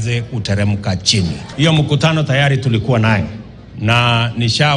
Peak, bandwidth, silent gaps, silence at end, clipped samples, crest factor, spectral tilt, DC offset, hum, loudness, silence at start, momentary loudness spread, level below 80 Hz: 0 dBFS; 10.5 kHz; none; 0 s; under 0.1%; 14 dB; -5 dB/octave; under 0.1%; none; -15 LUFS; 0 s; 8 LU; -40 dBFS